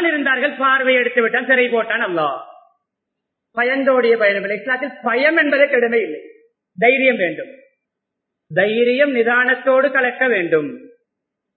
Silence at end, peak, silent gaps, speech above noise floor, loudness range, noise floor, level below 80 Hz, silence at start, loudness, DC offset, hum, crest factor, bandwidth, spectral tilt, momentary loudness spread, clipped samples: 0.7 s; 0 dBFS; none; 63 dB; 2 LU; -80 dBFS; -76 dBFS; 0 s; -16 LUFS; under 0.1%; none; 18 dB; 4.5 kHz; -9.5 dB/octave; 8 LU; under 0.1%